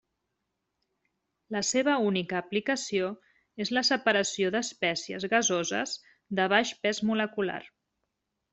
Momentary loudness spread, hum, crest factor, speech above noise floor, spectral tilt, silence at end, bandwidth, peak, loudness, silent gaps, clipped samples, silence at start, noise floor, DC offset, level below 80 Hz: 10 LU; none; 22 dB; 54 dB; -3 dB/octave; 0.85 s; 8.2 kHz; -8 dBFS; -28 LUFS; none; under 0.1%; 1.5 s; -82 dBFS; under 0.1%; -72 dBFS